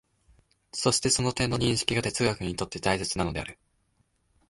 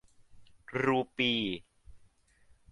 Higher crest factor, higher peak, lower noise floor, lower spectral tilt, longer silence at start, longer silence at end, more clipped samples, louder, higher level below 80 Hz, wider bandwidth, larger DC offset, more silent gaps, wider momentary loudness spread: about the same, 22 dB vs 20 dB; first, -8 dBFS vs -16 dBFS; first, -71 dBFS vs -64 dBFS; second, -3.5 dB/octave vs -5.5 dB/octave; first, 0.75 s vs 0.35 s; first, 0.95 s vs 0.75 s; neither; first, -27 LUFS vs -31 LUFS; first, -48 dBFS vs -64 dBFS; about the same, 11.5 kHz vs 11 kHz; neither; neither; about the same, 8 LU vs 10 LU